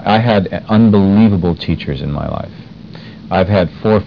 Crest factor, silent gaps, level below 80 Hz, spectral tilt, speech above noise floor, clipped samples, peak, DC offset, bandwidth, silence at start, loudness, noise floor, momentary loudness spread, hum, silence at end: 12 dB; none; -36 dBFS; -9.5 dB/octave; 20 dB; under 0.1%; 0 dBFS; 0.3%; 5.4 kHz; 0 s; -13 LUFS; -32 dBFS; 23 LU; none; 0 s